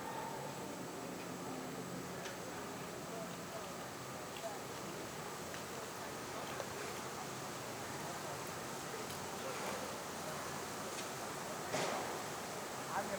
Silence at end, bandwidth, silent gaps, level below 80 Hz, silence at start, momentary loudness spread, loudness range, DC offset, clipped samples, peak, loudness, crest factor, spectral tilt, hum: 0 s; over 20 kHz; none; -74 dBFS; 0 s; 4 LU; 3 LU; under 0.1%; under 0.1%; -24 dBFS; -44 LUFS; 20 dB; -3 dB/octave; none